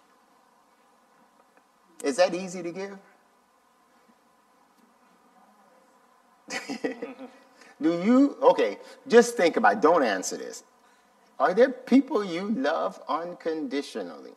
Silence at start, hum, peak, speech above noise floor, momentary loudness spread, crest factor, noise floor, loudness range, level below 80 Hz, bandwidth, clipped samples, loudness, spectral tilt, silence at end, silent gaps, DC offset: 2 s; none; -4 dBFS; 39 dB; 18 LU; 24 dB; -63 dBFS; 17 LU; -82 dBFS; 13.5 kHz; under 0.1%; -25 LUFS; -4.5 dB/octave; 0.05 s; none; under 0.1%